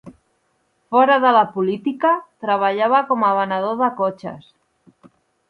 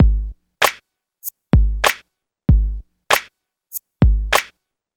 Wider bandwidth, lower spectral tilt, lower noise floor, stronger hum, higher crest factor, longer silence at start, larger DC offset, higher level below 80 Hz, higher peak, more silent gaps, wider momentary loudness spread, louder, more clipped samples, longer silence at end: second, 5.6 kHz vs 19.5 kHz; first, -7.5 dB/octave vs -4.5 dB/octave; first, -66 dBFS vs -55 dBFS; neither; about the same, 18 dB vs 18 dB; about the same, 0.05 s vs 0 s; neither; second, -68 dBFS vs -22 dBFS; about the same, -2 dBFS vs 0 dBFS; neither; second, 9 LU vs 15 LU; about the same, -18 LUFS vs -18 LUFS; neither; first, 1.1 s vs 0.5 s